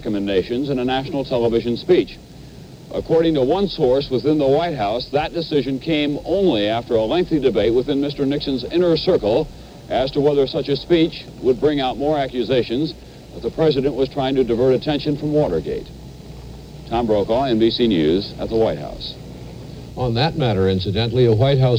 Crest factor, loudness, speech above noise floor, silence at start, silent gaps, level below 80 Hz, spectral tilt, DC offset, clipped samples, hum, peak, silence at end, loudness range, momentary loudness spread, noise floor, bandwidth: 14 dB; -19 LUFS; 20 dB; 0 s; none; -40 dBFS; -7.5 dB/octave; under 0.1%; under 0.1%; none; -4 dBFS; 0 s; 2 LU; 14 LU; -39 dBFS; 16.5 kHz